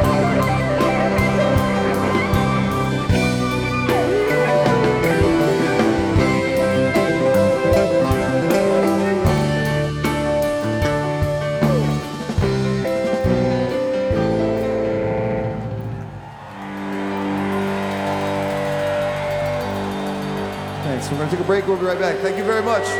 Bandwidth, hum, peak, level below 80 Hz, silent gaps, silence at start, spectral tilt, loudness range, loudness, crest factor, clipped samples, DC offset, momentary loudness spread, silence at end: 19.5 kHz; none; -6 dBFS; -36 dBFS; none; 0 s; -6.5 dB/octave; 6 LU; -19 LUFS; 12 dB; under 0.1%; under 0.1%; 8 LU; 0 s